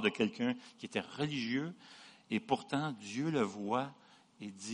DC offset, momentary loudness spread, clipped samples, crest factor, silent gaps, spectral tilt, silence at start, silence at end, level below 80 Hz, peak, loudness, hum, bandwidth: under 0.1%; 15 LU; under 0.1%; 22 dB; none; -5 dB/octave; 0 s; 0 s; -78 dBFS; -16 dBFS; -37 LUFS; none; 10.5 kHz